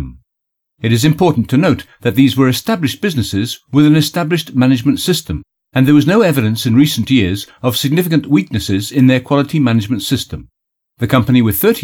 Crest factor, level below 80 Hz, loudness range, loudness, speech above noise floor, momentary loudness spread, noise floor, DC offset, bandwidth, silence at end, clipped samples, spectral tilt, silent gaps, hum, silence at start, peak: 12 dB; -42 dBFS; 2 LU; -13 LUFS; 63 dB; 8 LU; -76 dBFS; under 0.1%; 19 kHz; 0 s; under 0.1%; -6 dB/octave; none; none; 0 s; 0 dBFS